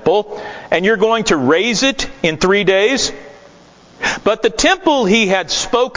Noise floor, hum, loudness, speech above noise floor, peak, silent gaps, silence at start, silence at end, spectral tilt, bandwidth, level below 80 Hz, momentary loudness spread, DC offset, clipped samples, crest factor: -44 dBFS; none; -14 LUFS; 29 dB; 0 dBFS; none; 0 s; 0 s; -3.5 dB/octave; 7.8 kHz; -42 dBFS; 8 LU; under 0.1%; under 0.1%; 14 dB